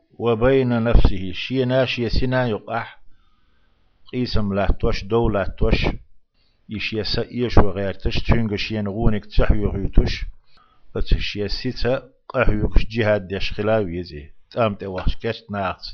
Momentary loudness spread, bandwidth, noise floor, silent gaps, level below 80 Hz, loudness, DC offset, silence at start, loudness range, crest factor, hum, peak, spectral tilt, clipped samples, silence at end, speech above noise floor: 9 LU; 6.4 kHz; -58 dBFS; none; -26 dBFS; -22 LUFS; under 0.1%; 0.2 s; 3 LU; 18 dB; none; 0 dBFS; -7.5 dB/octave; under 0.1%; 0 s; 39 dB